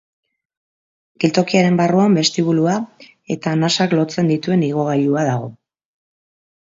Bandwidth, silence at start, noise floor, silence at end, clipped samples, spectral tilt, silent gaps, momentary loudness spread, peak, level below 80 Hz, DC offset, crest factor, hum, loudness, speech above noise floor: 7.8 kHz; 1.2 s; under -90 dBFS; 1.15 s; under 0.1%; -5.5 dB/octave; none; 10 LU; 0 dBFS; -62 dBFS; under 0.1%; 18 dB; none; -17 LUFS; over 74 dB